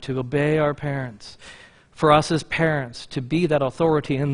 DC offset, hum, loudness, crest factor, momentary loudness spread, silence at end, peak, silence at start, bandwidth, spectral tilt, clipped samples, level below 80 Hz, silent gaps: under 0.1%; none; -22 LUFS; 20 dB; 15 LU; 0 s; -2 dBFS; 0 s; 10.5 kHz; -6.5 dB/octave; under 0.1%; -50 dBFS; none